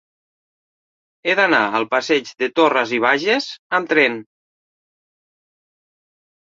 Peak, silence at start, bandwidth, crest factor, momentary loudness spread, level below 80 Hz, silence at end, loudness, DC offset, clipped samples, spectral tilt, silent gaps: 0 dBFS; 1.25 s; 7.6 kHz; 20 dB; 7 LU; -70 dBFS; 2.25 s; -17 LUFS; under 0.1%; under 0.1%; -3.5 dB/octave; 3.59-3.70 s